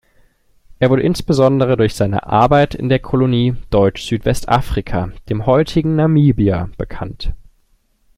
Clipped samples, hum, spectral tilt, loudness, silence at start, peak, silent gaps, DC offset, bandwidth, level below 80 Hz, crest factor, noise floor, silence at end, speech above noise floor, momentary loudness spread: under 0.1%; none; -7.5 dB/octave; -15 LUFS; 0.8 s; 0 dBFS; none; under 0.1%; 14.5 kHz; -32 dBFS; 16 dB; -57 dBFS; 0.8 s; 43 dB; 11 LU